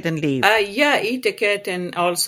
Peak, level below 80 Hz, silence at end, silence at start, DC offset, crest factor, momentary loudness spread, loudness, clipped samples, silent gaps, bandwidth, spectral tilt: 0 dBFS; -62 dBFS; 0 s; 0 s; under 0.1%; 20 dB; 6 LU; -19 LUFS; under 0.1%; none; 16.5 kHz; -3.5 dB/octave